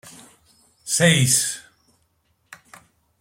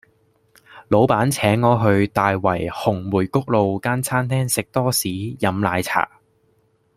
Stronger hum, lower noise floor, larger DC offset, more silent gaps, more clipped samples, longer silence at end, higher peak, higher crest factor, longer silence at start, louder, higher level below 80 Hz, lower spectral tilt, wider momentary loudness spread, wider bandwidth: neither; first, -67 dBFS vs -62 dBFS; neither; neither; neither; first, 1.6 s vs 0.9 s; about the same, -2 dBFS vs -2 dBFS; about the same, 22 dB vs 18 dB; second, 0.05 s vs 0.7 s; about the same, -18 LUFS vs -20 LUFS; second, -58 dBFS vs -52 dBFS; second, -3 dB/octave vs -5.5 dB/octave; first, 20 LU vs 6 LU; about the same, 16.5 kHz vs 16 kHz